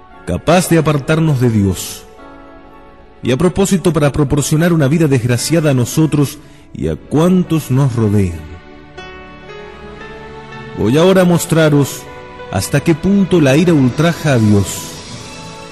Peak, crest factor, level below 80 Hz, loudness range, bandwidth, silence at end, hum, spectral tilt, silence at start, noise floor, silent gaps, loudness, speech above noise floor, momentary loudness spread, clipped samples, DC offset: 0 dBFS; 14 dB; -38 dBFS; 4 LU; 13 kHz; 0 s; none; -6 dB/octave; 0.25 s; -40 dBFS; none; -13 LUFS; 28 dB; 21 LU; under 0.1%; 0.6%